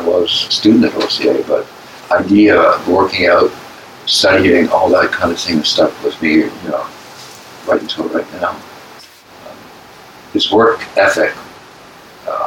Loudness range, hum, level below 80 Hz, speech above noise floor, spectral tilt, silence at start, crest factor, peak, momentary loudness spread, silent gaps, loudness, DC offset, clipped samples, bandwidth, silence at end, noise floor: 10 LU; none; -52 dBFS; 26 dB; -4 dB/octave; 0 s; 14 dB; 0 dBFS; 20 LU; none; -13 LUFS; under 0.1%; under 0.1%; 16.5 kHz; 0 s; -38 dBFS